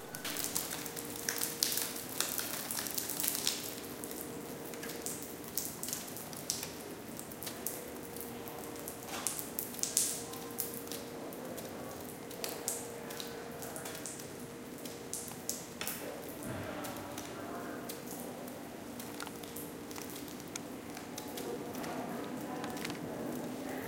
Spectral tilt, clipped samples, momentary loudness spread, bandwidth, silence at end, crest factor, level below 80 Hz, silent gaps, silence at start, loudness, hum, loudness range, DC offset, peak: -2 dB/octave; under 0.1%; 11 LU; 17 kHz; 0 s; 38 dB; -68 dBFS; none; 0 s; -39 LUFS; none; 8 LU; under 0.1%; -4 dBFS